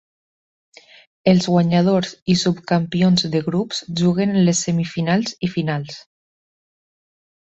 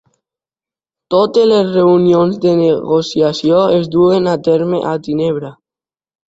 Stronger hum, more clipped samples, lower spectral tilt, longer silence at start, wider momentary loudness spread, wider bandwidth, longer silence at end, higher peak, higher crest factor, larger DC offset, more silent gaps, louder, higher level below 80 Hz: neither; neither; second, -5.5 dB/octave vs -7 dB/octave; first, 1.25 s vs 1.1 s; about the same, 7 LU vs 7 LU; about the same, 8.2 kHz vs 8 kHz; first, 1.55 s vs 0.75 s; about the same, -2 dBFS vs 0 dBFS; first, 18 dB vs 12 dB; neither; first, 2.22-2.26 s vs none; second, -19 LUFS vs -13 LUFS; about the same, -56 dBFS vs -52 dBFS